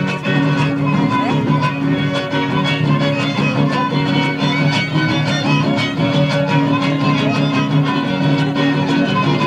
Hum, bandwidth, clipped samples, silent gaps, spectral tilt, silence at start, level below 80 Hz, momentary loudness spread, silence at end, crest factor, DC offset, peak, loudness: none; 9 kHz; under 0.1%; none; -6.5 dB/octave; 0 s; -48 dBFS; 2 LU; 0 s; 14 dB; under 0.1%; -2 dBFS; -16 LUFS